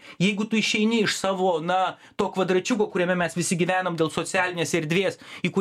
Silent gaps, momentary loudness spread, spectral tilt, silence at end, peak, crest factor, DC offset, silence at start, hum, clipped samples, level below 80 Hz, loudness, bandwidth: none; 5 LU; -4.5 dB/octave; 0 s; -8 dBFS; 16 dB; under 0.1%; 0.05 s; none; under 0.1%; -64 dBFS; -24 LUFS; 15 kHz